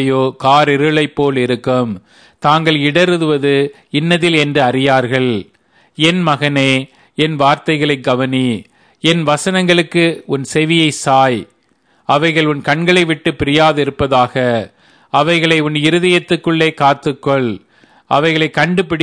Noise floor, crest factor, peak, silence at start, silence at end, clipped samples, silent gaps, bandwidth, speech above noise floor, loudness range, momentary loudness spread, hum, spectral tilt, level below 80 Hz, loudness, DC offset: -56 dBFS; 14 dB; 0 dBFS; 0 s; 0 s; under 0.1%; none; 11 kHz; 43 dB; 1 LU; 6 LU; none; -5.5 dB/octave; -48 dBFS; -13 LUFS; 0.1%